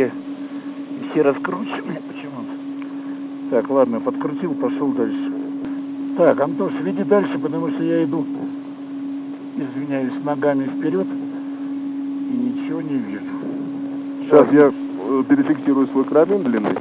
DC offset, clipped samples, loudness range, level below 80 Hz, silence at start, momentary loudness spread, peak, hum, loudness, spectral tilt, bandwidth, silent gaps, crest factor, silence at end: under 0.1%; under 0.1%; 6 LU; -72 dBFS; 0 s; 13 LU; 0 dBFS; none; -21 LUFS; -11.5 dB/octave; 4 kHz; none; 20 dB; 0 s